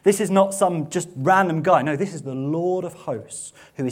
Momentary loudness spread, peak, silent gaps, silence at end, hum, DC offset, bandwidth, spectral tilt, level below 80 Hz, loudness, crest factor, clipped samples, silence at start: 13 LU; -2 dBFS; none; 0 s; none; under 0.1%; 16 kHz; -5.5 dB/octave; -66 dBFS; -21 LUFS; 18 dB; under 0.1%; 0.05 s